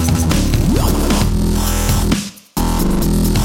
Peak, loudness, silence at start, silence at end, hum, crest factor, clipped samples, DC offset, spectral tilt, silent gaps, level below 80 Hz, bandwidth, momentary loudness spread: -2 dBFS; -16 LUFS; 0 s; 0 s; none; 12 dB; under 0.1%; 0.7%; -5 dB/octave; none; -18 dBFS; 17 kHz; 4 LU